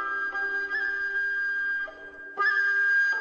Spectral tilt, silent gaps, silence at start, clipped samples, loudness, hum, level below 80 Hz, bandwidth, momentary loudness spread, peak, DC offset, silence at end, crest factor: -1 dB/octave; none; 0 s; under 0.1%; -25 LUFS; none; -64 dBFS; 6.8 kHz; 11 LU; -16 dBFS; under 0.1%; 0 s; 12 dB